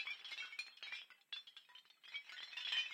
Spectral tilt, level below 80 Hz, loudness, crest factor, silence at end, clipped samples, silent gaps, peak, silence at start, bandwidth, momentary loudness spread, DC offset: 3.5 dB/octave; under -90 dBFS; -47 LUFS; 22 dB; 0 s; under 0.1%; none; -28 dBFS; 0 s; 16.5 kHz; 17 LU; under 0.1%